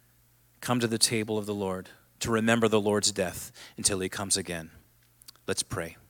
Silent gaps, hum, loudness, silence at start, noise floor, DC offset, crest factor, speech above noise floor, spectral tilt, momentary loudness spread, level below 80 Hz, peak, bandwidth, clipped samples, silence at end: none; none; -28 LUFS; 0.6 s; -63 dBFS; under 0.1%; 22 dB; 34 dB; -3 dB/octave; 14 LU; -60 dBFS; -8 dBFS; 17 kHz; under 0.1%; 0.15 s